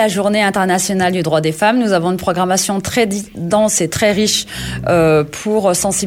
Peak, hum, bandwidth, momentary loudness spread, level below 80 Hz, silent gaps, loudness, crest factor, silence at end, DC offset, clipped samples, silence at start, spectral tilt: -2 dBFS; none; 17 kHz; 5 LU; -42 dBFS; none; -15 LUFS; 12 dB; 0 s; under 0.1%; under 0.1%; 0 s; -4 dB/octave